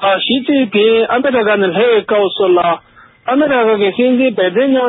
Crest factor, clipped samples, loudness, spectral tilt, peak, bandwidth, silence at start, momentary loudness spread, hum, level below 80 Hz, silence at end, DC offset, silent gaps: 10 dB; under 0.1%; -12 LUFS; -10.5 dB/octave; -2 dBFS; 4.1 kHz; 0 s; 3 LU; none; -58 dBFS; 0 s; under 0.1%; none